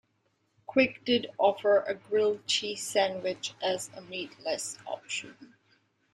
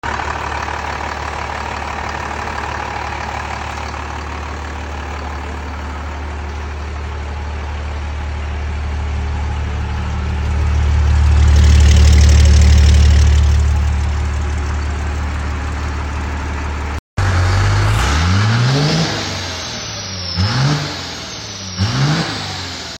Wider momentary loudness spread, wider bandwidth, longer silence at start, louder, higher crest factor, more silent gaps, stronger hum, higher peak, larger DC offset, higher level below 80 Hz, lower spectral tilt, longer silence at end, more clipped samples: second, 12 LU vs 15 LU; first, 14.5 kHz vs 9.2 kHz; first, 0.7 s vs 0.05 s; second, -30 LUFS vs -17 LUFS; first, 20 dB vs 14 dB; second, none vs 16.99-17.17 s; neither; second, -10 dBFS vs -2 dBFS; neither; second, -74 dBFS vs -18 dBFS; second, -2.5 dB/octave vs -5 dB/octave; first, 0.7 s vs 0 s; neither